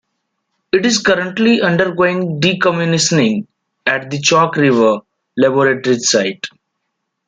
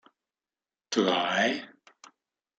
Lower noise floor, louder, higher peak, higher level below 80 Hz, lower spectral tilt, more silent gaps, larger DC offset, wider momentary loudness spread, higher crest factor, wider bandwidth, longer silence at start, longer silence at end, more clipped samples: second, -73 dBFS vs under -90 dBFS; first, -14 LUFS vs -27 LUFS; first, 0 dBFS vs -10 dBFS; first, -56 dBFS vs -80 dBFS; about the same, -4 dB/octave vs -3.5 dB/octave; neither; neither; about the same, 9 LU vs 7 LU; second, 14 dB vs 20 dB; about the same, 9.6 kHz vs 9 kHz; second, 0.75 s vs 0.9 s; about the same, 0.8 s vs 0.9 s; neither